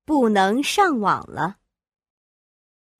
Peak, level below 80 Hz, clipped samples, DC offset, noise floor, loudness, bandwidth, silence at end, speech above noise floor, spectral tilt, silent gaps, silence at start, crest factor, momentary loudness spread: -6 dBFS; -58 dBFS; under 0.1%; under 0.1%; under -90 dBFS; -20 LUFS; 15.5 kHz; 1.5 s; over 70 dB; -4.5 dB/octave; none; 0.1 s; 16 dB; 10 LU